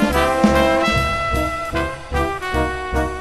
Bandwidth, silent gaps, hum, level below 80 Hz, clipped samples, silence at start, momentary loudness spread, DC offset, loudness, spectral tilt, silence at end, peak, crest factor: 13.5 kHz; none; none; -28 dBFS; under 0.1%; 0 s; 8 LU; 0.6%; -19 LUFS; -5.5 dB/octave; 0 s; -2 dBFS; 18 dB